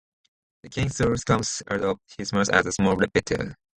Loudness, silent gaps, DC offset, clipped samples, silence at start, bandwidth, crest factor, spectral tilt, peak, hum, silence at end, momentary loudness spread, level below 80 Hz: -24 LUFS; none; under 0.1%; under 0.1%; 0.65 s; 11.5 kHz; 22 dB; -4.5 dB/octave; -2 dBFS; none; 0.2 s; 8 LU; -46 dBFS